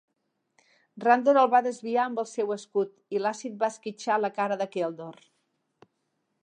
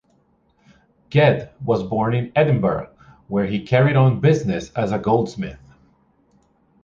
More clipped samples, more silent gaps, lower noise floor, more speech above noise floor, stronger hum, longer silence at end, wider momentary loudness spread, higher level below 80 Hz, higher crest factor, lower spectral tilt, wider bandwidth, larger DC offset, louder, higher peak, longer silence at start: neither; neither; first, -78 dBFS vs -61 dBFS; first, 52 dB vs 43 dB; neither; about the same, 1.3 s vs 1.3 s; about the same, 11 LU vs 11 LU; second, -88 dBFS vs -50 dBFS; about the same, 22 dB vs 18 dB; second, -4.5 dB/octave vs -8 dB/octave; first, 9.8 kHz vs 7.4 kHz; neither; second, -27 LUFS vs -19 LUFS; second, -6 dBFS vs -2 dBFS; second, 0.95 s vs 1.1 s